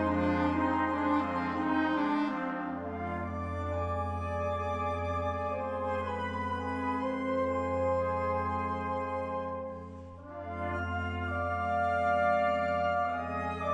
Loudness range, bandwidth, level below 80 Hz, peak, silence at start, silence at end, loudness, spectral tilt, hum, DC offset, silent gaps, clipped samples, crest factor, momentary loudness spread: 4 LU; 10 kHz; -52 dBFS; -18 dBFS; 0 s; 0 s; -32 LUFS; -7.5 dB/octave; none; under 0.1%; none; under 0.1%; 14 dB; 7 LU